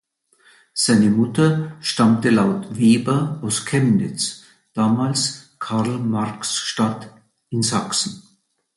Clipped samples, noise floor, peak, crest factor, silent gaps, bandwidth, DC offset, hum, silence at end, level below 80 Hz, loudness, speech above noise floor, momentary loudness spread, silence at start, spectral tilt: under 0.1%; -57 dBFS; -4 dBFS; 16 dB; none; 11.5 kHz; under 0.1%; none; 0.55 s; -58 dBFS; -19 LUFS; 38 dB; 10 LU; 0.75 s; -4.5 dB/octave